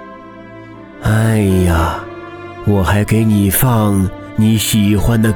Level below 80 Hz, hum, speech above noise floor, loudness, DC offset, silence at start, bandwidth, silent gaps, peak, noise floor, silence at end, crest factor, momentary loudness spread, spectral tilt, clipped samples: -28 dBFS; none; 22 dB; -14 LUFS; under 0.1%; 0 s; over 20 kHz; none; -2 dBFS; -34 dBFS; 0 s; 12 dB; 22 LU; -6 dB/octave; under 0.1%